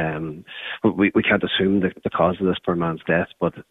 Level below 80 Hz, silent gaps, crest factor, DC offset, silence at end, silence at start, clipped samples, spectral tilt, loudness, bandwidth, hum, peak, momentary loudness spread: -50 dBFS; none; 18 dB; under 0.1%; 0.1 s; 0 s; under 0.1%; -8.5 dB/octave; -21 LUFS; 4 kHz; none; -4 dBFS; 11 LU